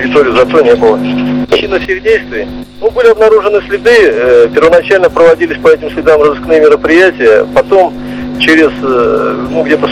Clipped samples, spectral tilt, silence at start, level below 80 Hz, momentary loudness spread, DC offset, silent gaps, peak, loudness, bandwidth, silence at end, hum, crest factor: 4%; -5.5 dB/octave; 0 s; -34 dBFS; 7 LU; 0.5%; none; 0 dBFS; -7 LUFS; 11.5 kHz; 0 s; none; 8 dB